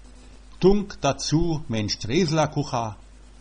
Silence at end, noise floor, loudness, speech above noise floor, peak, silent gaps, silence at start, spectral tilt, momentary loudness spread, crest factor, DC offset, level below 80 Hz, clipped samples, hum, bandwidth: 0.45 s; -45 dBFS; -24 LUFS; 23 dB; -6 dBFS; none; 0.15 s; -5.5 dB/octave; 7 LU; 20 dB; under 0.1%; -38 dBFS; under 0.1%; none; 9.8 kHz